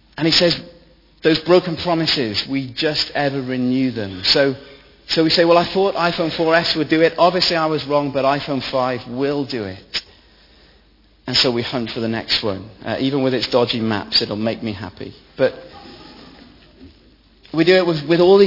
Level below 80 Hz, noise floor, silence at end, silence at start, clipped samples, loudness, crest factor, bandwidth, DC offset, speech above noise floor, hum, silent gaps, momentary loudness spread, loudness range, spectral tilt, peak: -50 dBFS; -53 dBFS; 0 s; 0.15 s; under 0.1%; -18 LUFS; 18 dB; 5.8 kHz; under 0.1%; 35 dB; none; none; 12 LU; 6 LU; -5.5 dB/octave; 0 dBFS